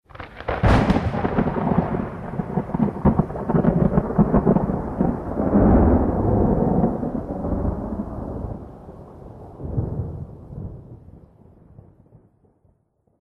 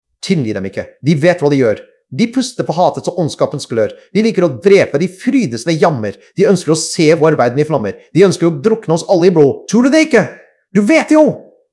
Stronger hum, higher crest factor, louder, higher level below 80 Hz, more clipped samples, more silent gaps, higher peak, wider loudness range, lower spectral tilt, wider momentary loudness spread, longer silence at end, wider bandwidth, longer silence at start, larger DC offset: neither; first, 18 dB vs 12 dB; second, -21 LUFS vs -13 LUFS; first, -32 dBFS vs -58 dBFS; second, under 0.1% vs 0.3%; neither; second, -4 dBFS vs 0 dBFS; first, 15 LU vs 3 LU; first, -9.5 dB/octave vs -6 dB/octave; first, 19 LU vs 8 LU; first, 2.05 s vs 0.3 s; second, 7.4 kHz vs 12 kHz; about the same, 0.15 s vs 0.25 s; neither